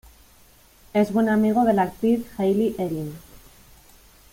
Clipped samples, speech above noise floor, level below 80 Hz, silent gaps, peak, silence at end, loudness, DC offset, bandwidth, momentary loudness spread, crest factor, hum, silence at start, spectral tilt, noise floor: under 0.1%; 32 dB; -54 dBFS; none; -8 dBFS; 1.1 s; -22 LUFS; under 0.1%; 16.5 kHz; 11 LU; 16 dB; none; 0.95 s; -7.5 dB/octave; -53 dBFS